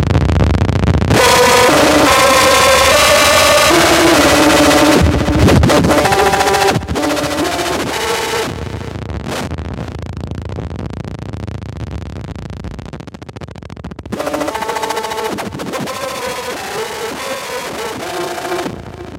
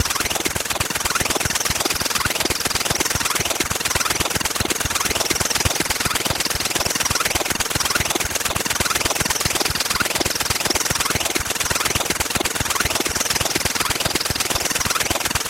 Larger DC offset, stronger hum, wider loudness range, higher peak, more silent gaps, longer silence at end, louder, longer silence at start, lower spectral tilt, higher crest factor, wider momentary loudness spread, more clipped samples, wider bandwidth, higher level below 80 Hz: neither; neither; first, 17 LU vs 0 LU; first, 0 dBFS vs -4 dBFS; neither; about the same, 0 s vs 0 s; first, -12 LUFS vs -19 LUFS; about the same, 0 s vs 0 s; first, -4 dB/octave vs -1.5 dB/octave; about the same, 14 dB vs 16 dB; first, 19 LU vs 2 LU; neither; about the same, 17 kHz vs 17 kHz; first, -28 dBFS vs -38 dBFS